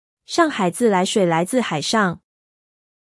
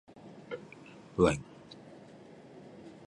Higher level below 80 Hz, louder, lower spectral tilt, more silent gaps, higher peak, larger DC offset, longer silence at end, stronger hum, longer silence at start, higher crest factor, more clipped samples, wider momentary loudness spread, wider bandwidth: second, -66 dBFS vs -56 dBFS; first, -19 LUFS vs -33 LUFS; second, -4.5 dB/octave vs -6 dB/octave; neither; first, -4 dBFS vs -10 dBFS; neither; first, 0.85 s vs 0.15 s; neither; about the same, 0.3 s vs 0.25 s; second, 16 dB vs 26 dB; neither; second, 5 LU vs 24 LU; about the same, 12 kHz vs 11 kHz